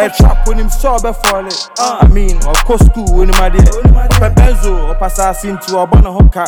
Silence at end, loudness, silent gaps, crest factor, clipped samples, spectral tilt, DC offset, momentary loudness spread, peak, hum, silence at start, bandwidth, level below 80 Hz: 0 s; -11 LUFS; none; 8 dB; 3%; -5.5 dB/octave; under 0.1%; 8 LU; 0 dBFS; none; 0 s; over 20 kHz; -10 dBFS